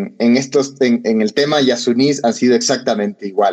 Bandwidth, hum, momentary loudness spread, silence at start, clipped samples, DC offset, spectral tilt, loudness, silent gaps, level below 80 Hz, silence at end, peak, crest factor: 8.8 kHz; none; 4 LU; 0 s; under 0.1%; under 0.1%; -4 dB/octave; -15 LUFS; none; -66 dBFS; 0 s; -2 dBFS; 12 dB